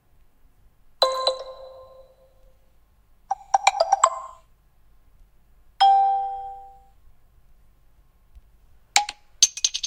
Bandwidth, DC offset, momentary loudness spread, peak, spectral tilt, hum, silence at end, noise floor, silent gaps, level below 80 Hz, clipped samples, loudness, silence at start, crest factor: 17 kHz; under 0.1%; 22 LU; 0 dBFS; 2.5 dB/octave; none; 0 s; -57 dBFS; none; -56 dBFS; under 0.1%; -22 LUFS; 1 s; 26 dB